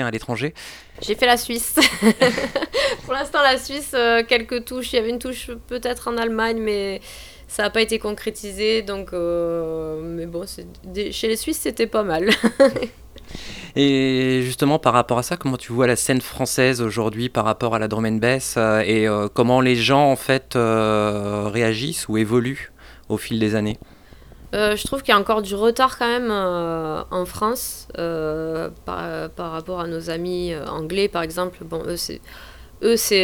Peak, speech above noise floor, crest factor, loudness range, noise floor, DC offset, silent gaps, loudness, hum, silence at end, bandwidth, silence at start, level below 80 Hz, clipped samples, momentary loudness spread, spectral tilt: 0 dBFS; 23 dB; 20 dB; 7 LU; -44 dBFS; under 0.1%; none; -21 LUFS; none; 0 s; over 20 kHz; 0 s; -46 dBFS; under 0.1%; 13 LU; -4 dB/octave